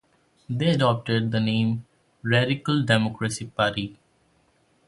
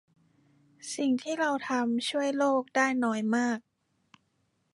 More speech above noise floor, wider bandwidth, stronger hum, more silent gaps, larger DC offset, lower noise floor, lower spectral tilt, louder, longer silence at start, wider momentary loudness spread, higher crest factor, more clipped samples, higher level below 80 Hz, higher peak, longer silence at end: second, 41 dB vs 46 dB; about the same, 11.5 kHz vs 11.5 kHz; neither; neither; neither; second, -64 dBFS vs -74 dBFS; first, -6 dB/octave vs -3.5 dB/octave; first, -24 LUFS vs -29 LUFS; second, 0.5 s vs 0.85 s; first, 11 LU vs 5 LU; about the same, 22 dB vs 18 dB; neither; first, -56 dBFS vs -84 dBFS; first, -4 dBFS vs -12 dBFS; second, 0.95 s vs 1.15 s